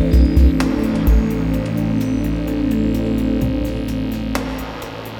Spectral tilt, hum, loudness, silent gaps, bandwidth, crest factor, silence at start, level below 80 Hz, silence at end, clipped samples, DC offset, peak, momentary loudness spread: -7.5 dB/octave; none; -19 LUFS; none; 17.5 kHz; 16 dB; 0 s; -20 dBFS; 0 s; under 0.1%; under 0.1%; -2 dBFS; 8 LU